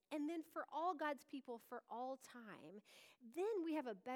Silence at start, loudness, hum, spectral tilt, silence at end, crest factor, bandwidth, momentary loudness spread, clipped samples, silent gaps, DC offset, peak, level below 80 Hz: 0.1 s; -47 LUFS; none; -4.5 dB/octave; 0 s; 16 dB; 19.5 kHz; 16 LU; under 0.1%; none; under 0.1%; -32 dBFS; under -90 dBFS